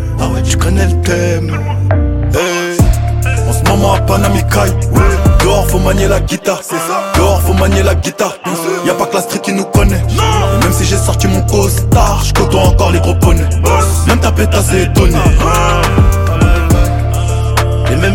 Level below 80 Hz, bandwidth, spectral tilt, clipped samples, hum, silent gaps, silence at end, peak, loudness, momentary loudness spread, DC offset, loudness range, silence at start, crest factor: -16 dBFS; 17 kHz; -5.5 dB/octave; under 0.1%; none; none; 0 s; 0 dBFS; -11 LUFS; 5 LU; under 0.1%; 2 LU; 0 s; 10 dB